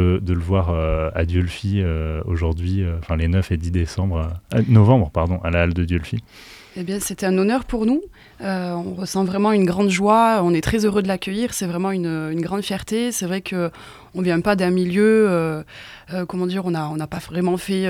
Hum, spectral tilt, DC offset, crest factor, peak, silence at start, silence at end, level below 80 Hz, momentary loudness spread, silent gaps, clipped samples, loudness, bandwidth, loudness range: none; -6.5 dB/octave; under 0.1%; 18 dB; -2 dBFS; 0 s; 0 s; -36 dBFS; 11 LU; none; under 0.1%; -20 LUFS; 15.5 kHz; 4 LU